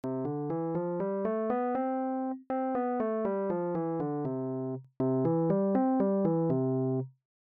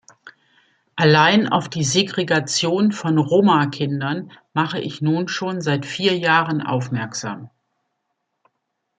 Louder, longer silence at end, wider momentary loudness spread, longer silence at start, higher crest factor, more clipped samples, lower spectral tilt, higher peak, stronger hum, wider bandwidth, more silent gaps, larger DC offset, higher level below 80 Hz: second, -31 LUFS vs -19 LUFS; second, 0.4 s vs 1.5 s; second, 7 LU vs 11 LU; second, 0.05 s vs 0.25 s; about the same, 14 dB vs 18 dB; neither; first, -10.5 dB/octave vs -4.5 dB/octave; second, -16 dBFS vs -2 dBFS; neither; second, 3.2 kHz vs 9.4 kHz; neither; neither; second, -70 dBFS vs -64 dBFS